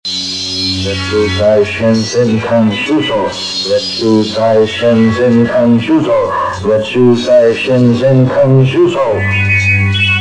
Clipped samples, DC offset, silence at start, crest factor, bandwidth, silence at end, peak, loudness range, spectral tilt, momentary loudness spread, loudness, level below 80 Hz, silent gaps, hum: under 0.1%; under 0.1%; 0.05 s; 10 dB; 10.5 kHz; 0 s; 0 dBFS; 3 LU; -6 dB/octave; 5 LU; -11 LUFS; -46 dBFS; none; none